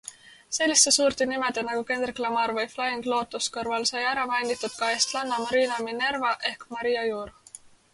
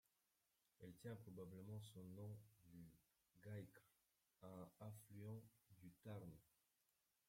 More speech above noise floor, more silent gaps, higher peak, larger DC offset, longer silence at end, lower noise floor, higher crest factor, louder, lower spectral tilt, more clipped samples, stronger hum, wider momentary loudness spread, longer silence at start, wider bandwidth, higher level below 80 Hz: second, 24 dB vs 30 dB; neither; first, -6 dBFS vs -44 dBFS; neither; second, 0.35 s vs 0.8 s; second, -50 dBFS vs -88 dBFS; first, 22 dB vs 16 dB; first, -25 LUFS vs -60 LUFS; second, -0.5 dB/octave vs -7 dB/octave; neither; neither; about the same, 9 LU vs 9 LU; second, 0.05 s vs 0.8 s; second, 11.5 kHz vs 16.5 kHz; first, -64 dBFS vs -86 dBFS